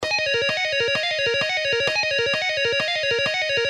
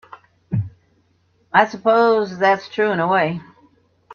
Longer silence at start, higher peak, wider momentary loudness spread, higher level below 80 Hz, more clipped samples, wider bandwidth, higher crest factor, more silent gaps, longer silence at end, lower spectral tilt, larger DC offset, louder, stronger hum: second, 0 s vs 0.5 s; second, -8 dBFS vs 0 dBFS; second, 1 LU vs 11 LU; about the same, -58 dBFS vs -58 dBFS; neither; first, 12.5 kHz vs 6.8 kHz; second, 14 dB vs 20 dB; neither; about the same, 0 s vs 0 s; second, -1.5 dB/octave vs -6.5 dB/octave; neither; about the same, -20 LUFS vs -18 LUFS; neither